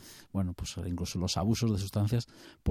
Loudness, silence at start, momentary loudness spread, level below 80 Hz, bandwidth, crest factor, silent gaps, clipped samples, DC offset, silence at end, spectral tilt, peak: -33 LUFS; 0 s; 9 LU; -50 dBFS; 15 kHz; 16 dB; none; under 0.1%; under 0.1%; 0 s; -6 dB/octave; -16 dBFS